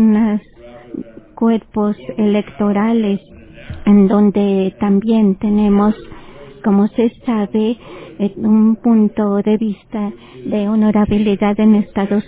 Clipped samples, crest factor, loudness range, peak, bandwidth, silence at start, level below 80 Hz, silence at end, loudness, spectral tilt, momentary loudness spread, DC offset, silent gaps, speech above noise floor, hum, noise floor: under 0.1%; 12 dB; 3 LU; -2 dBFS; 4 kHz; 0 s; -42 dBFS; 0.05 s; -15 LUFS; -12 dB/octave; 11 LU; under 0.1%; none; 24 dB; none; -38 dBFS